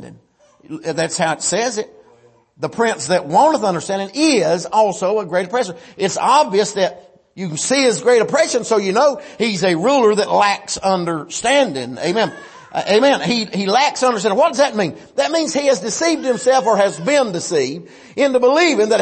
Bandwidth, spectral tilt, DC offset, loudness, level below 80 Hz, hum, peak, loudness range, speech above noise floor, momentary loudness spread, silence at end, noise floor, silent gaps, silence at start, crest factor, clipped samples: 8.8 kHz; -3.5 dB/octave; under 0.1%; -16 LUFS; -60 dBFS; none; -2 dBFS; 2 LU; 35 dB; 9 LU; 0 s; -51 dBFS; none; 0 s; 14 dB; under 0.1%